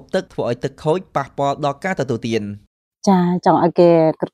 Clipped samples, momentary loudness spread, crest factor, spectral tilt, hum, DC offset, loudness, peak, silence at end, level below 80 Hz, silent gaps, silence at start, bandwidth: under 0.1%; 11 LU; 18 dB; -7 dB/octave; none; under 0.1%; -18 LUFS; 0 dBFS; 0.05 s; -56 dBFS; 2.67-2.92 s; 0.15 s; 10.5 kHz